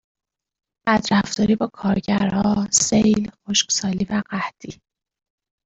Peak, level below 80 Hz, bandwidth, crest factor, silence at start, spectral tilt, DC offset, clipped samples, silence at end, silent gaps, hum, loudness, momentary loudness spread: -4 dBFS; -50 dBFS; 8.2 kHz; 18 dB; 0.85 s; -3.5 dB/octave; under 0.1%; under 0.1%; 0.9 s; none; none; -20 LUFS; 11 LU